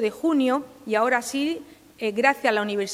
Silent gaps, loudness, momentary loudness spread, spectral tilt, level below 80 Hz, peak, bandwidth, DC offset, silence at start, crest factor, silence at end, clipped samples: none; -23 LUFS; 8 LU; -3.5 dB/octave; -68 dBFS; -4 dBFS; 16 kHz; under 0.1%; 0 s; 20 dB; 0 s; under 0.1%